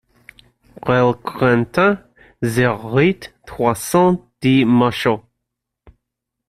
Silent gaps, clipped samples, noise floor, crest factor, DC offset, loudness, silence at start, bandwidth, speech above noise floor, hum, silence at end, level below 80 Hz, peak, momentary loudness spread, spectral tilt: none; under 0.1%; -79 dBFS; 16 dB; under 0.1%; -17 LUFS; 0.85 s; 14.5 kHz; 64 dB; none; 1.3 s; -50 dBFS; -2 dBFS; 11 LU; -6 dB/octave